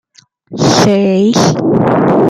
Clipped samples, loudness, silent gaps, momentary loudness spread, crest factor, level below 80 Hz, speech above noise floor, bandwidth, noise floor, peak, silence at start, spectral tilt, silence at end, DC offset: under 0.1%; -10 LUFS; none; 4 LU; 10 dB; -44 dBFS; 33 dB; 13.5 kHz; -42 dBFS; 0 dBFS; 0.5 s; -5.5 dB/octave; 0 s; under 0.1%